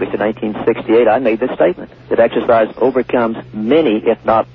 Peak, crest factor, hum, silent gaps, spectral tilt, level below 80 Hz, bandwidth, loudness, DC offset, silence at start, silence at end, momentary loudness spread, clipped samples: -2 dBFS; 12 dB; none; none; -9 dB/octave; -48 dBFS; 5.4 kHz; -14 LUFS; under 0.1%; 0 s; 0.1 s; 6 LU; under 0.1%